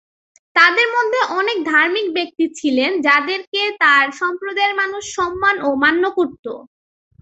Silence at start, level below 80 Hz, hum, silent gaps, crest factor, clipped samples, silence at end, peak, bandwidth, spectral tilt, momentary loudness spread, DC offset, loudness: 0.55 s; -58 dBFS; none; 3.47-3.52 s, 6.39-6.43 s; 16 dB; under 0.1%; 0.6 s; 0 dBFS; 8.2 kHz; -2 dB/octave; 10 LU; under 0.1%; -16 LUFS